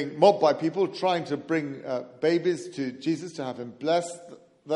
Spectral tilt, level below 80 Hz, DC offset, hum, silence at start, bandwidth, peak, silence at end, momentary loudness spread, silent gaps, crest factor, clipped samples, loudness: -5.5 dB/octave; -76 dBFS; under 0.1%; none; 0 s; 11.5 kHz; -6 dBFS; 0 s; 13 LU; none; 20 dB; under 0.1%; -27 LUFS